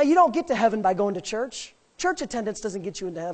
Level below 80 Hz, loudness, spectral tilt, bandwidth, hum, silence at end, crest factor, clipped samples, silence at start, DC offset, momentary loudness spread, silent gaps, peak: -58 dBFS; -25 LUFS; -4.5 dB/octave; 9 kHz; none; 0 s; 18 dB; under 0.1%; 0 s; under 0.1%; 12 LU; none; -6 dBFS